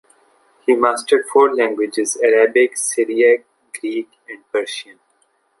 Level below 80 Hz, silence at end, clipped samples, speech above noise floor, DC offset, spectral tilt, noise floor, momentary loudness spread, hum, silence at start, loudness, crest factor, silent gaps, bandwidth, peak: -68 dBFS; 0.8 s; under 0.1%; 46 dB; under 0.1%; -1.5 dB/octave; -62 dBFS; 14 LU; none; 0.7 s; -17 LUFS; 16 dB; none; 11.5 kHz; -2 dBFS